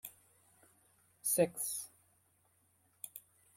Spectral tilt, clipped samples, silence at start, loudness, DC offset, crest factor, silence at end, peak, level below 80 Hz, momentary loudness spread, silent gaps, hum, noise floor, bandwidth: -3.5 dB/octave; under 0.1%; 0.05 s; -35 LUFS; under 0.1%; 24 dB; 0.4 s; -18 dBFS; -82 dBFS; 20 LU; none; none; -74 dBFS; 16.5 kHz